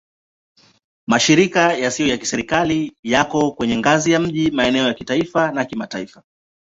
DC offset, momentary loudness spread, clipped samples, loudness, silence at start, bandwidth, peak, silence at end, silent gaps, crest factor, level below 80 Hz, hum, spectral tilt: under 0.1%; 10 LU; under 0.1%; -18 LUFS; 1.1 s; 7.8 kHz; -2 dBFS; 0.7 s; 2.99-3.03 s; 18 dB; -50 dBFS; none; -4 dB/octave